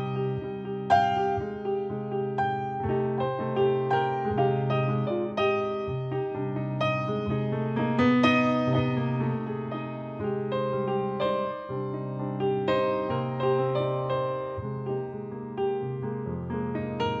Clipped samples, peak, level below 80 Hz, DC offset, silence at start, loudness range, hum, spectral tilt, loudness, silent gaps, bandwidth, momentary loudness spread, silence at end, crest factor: under 0.1%; -10 dBFS; -58 dBFS; under 0.1%; 0 s; 4 LU; none; -8 dB/octave; -28 LUFS; none; 7 kHz; 9 LU; 0 s; 18 dB